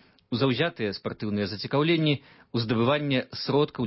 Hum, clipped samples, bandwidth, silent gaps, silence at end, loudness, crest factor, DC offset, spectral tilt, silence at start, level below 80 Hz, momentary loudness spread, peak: none; under 0.1%; 5.8 kHz; none; 0 s; -27 LUFS; 16 dB; under 0.1%; -10 dB/octave; 0.3 s; -60 dBFS; 8 LU; -10 dBFS